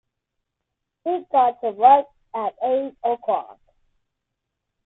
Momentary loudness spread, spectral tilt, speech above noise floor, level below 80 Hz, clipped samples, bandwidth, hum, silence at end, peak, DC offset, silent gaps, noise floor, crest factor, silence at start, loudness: 13 LU; -8.5 dB/octave; 61 dB; -70 dBFS; under 0.1%; 4 kHz; none; 1.35 s; -2 dBFS; under 0.1%; none; -81 dBFS; 20 dB; 1.05 s; -21 LUFS